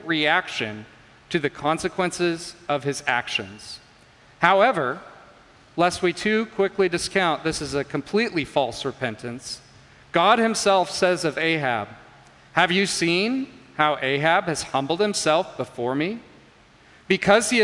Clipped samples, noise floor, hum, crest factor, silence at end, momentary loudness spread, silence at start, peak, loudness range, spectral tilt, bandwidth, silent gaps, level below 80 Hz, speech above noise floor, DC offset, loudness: under 0.1%; -53 dBFS; none; 22 dB; 0 s; 13 LU; 0 s; 0 dBFS; 4 LU; -4 dB/octave; 11.5 kHz; none; -58 dBFS; 30 dB; under 0.1%; -22 LUFS